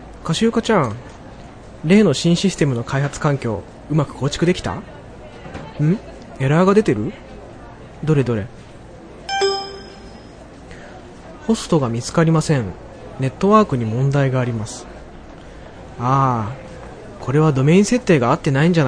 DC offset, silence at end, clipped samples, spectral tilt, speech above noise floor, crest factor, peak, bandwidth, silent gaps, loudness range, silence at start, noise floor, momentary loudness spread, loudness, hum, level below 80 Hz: under 0.1%; 0 s; under 0.1%; -6.5 dB/octave; 22 dB; 18 dB; 0 dBFS; 10.5 kHz; none; 6 LU; 0 s; -39 dBFS; 24 LU; -18 LUFS; none; -42 dBFS